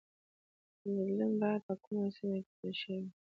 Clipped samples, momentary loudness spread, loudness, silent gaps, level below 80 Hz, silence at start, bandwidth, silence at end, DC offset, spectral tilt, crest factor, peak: under 0.1%; 9 LU; -37 LUFS; 1.63-1.69 s, 1.87-1.91 s, 2.46-2.63 s; -82 dBFS; 0.85 s; 5.2 kHz; 0.1 s; under 0.1%; -6 dB/octave; 16 dB; -22 dBFS